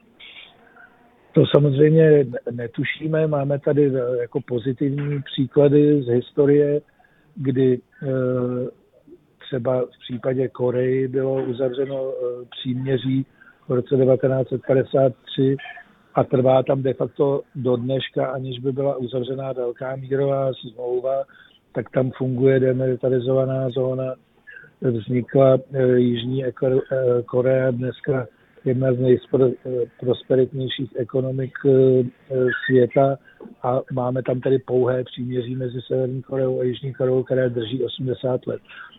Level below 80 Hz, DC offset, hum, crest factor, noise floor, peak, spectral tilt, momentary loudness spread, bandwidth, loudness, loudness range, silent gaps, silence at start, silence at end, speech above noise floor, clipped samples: -60 dBFS; under 0.1%; none; 20 dB; -53 dBFS; 0 dBFS; -11 dB/octave; 10 LU; 4 kHz; -21 LUFS; 5 LU; none; 0.2 s; 0.1 s; 33 dB; under 0.1%